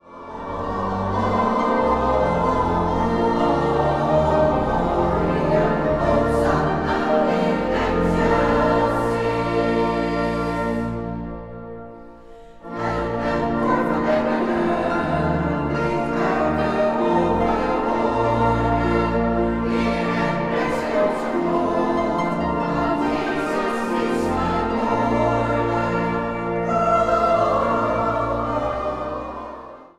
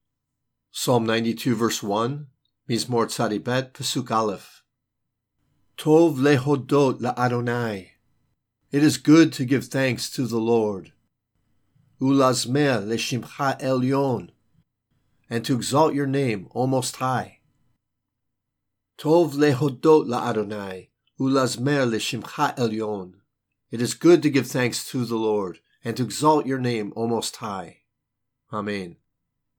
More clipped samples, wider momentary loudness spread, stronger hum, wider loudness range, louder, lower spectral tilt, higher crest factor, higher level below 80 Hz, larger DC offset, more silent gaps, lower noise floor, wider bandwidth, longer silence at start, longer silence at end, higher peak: neither; second, 7 LU vs 13 LU; neither; about the same, 4 LU vs 4 LU; about the same, -21 LUFS vs -23 LUFS; first, -7.5 dB/octave vs -5.5 dB/octave; about the same, 16 dB vs 20 dB; first, -36 dBFS vs -70 dBFS; neither; neither; second, -42 dBFS vs -80 dBFS; second, 12.5 kHz vs 18.5 kHz; second, 0.05 s vs 0.75 s; second, 0.1 s vs 0.65 s; about the same, -4 dBFS vs -4 dBFS